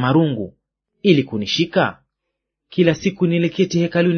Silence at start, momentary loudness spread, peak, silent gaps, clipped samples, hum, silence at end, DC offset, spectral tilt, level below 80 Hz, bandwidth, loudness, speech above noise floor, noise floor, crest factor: 0 s; 6 LU; 0 dBFS; none; under 0.1%; none; 0 s; under 0.1%; -6.5 dB/octave; -56 dBFS; 6.6 kHz; -18 LUFS; 62 dB; -79 dBFS; 18 dB